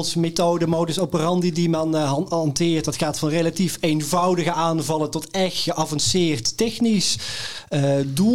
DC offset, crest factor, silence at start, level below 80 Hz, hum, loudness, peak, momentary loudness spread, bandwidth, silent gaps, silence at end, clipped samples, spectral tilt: 0.9%; 14 dB; 0 s; -52 dBFS; none; -21 LUFS; -6 dBFS; 4 LU; 16.5 kHz; none; 0 s; under 0.1%; -4.5 dB/octave